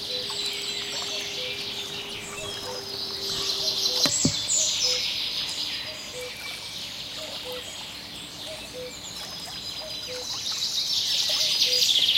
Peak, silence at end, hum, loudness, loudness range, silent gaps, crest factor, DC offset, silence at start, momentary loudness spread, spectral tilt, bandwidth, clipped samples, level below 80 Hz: -6 dBFS; 0 s; none; -26 LUFS; 10 LU; none; 24 dB; under 0.1%; 0 s; 14 LU; -0.5 dB/octave; 17 kHz; under 0.1%; -58 dBFS